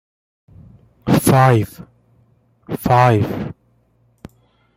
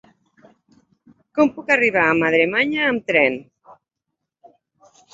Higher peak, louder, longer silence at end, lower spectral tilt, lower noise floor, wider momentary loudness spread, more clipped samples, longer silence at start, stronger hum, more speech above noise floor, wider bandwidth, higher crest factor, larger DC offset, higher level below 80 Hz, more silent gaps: about the same, -2 dBFS vs -2 dBFS; first, -15 LUFS vs -18 LUFS; second, 1.25 s vs 1.7 s; about the same, -6.5 dB/octave vs -5.5 dB/octave; second, -58 dBFS vs -80 dBFS; first, 17 LU vs 4 LU; neither; second, 1.05 s vs 1.35 s; neither; second, 44 dB vs 63 dB; first, 16 kHz vs 7.8 kHz; about the same, 18 dB vs 20 dB; neither; first, -46 dBFS vs -62 dBFS; neither